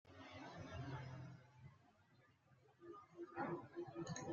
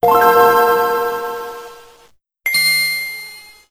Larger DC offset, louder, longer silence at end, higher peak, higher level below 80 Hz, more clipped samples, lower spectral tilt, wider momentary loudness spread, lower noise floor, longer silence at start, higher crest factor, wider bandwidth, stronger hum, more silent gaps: neither; second, -53 LUFS vs -14 LUFS; second, 0 s vs 0.3 s; second, -34 dBFS vs 0 dBFS; second, -78 dBFS vs -56 dBFS; neither; first, -5.5 dB/octave vs -1.5 dB/octave; about the same, 17 LU vs 19 LU; first, -74 dBFS vs -52 dBFS; about the same, 0.05 s vs 0.05 s; about the same, 20 dB vs 16 dB; second, 7.4 kHz vs 16 kHz; neither; neither